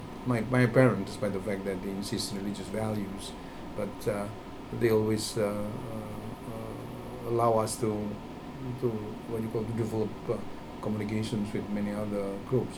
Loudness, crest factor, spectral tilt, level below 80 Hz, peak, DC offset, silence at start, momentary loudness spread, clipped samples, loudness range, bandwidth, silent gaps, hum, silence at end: -32 LUFS; 22 dB; -6 dB/octave; -52 dBFS; -8 dBFS; under 0.1%; 0 s; 14 LU; under 0.1%; 5 LU; over 20 kHz; none; none; 0 s